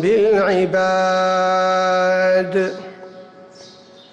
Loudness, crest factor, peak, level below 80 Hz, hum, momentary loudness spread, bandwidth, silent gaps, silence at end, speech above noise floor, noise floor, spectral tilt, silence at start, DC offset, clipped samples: -16 LUFS; 10 dB; -8 dBFS; -58 dBFS; none; 7 LU; 8.6 kHz; none; 0.45 s; 27 dB; -43 dBFS; -5 dB/octave; 0 s; under 0.1%; under 0.1%